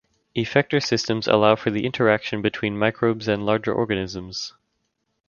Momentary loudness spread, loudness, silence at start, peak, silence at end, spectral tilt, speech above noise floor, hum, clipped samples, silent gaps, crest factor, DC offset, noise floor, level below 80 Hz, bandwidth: 11 LU; -22 LUFS; 0.35 s; 0 dBFS; 0.8 s; -5.5 dB/octave; 52 dB; none; under 0.1%; none; 22 dB; under 0.1%; -74 dBFS; -54 dBFS; 7.2 kHz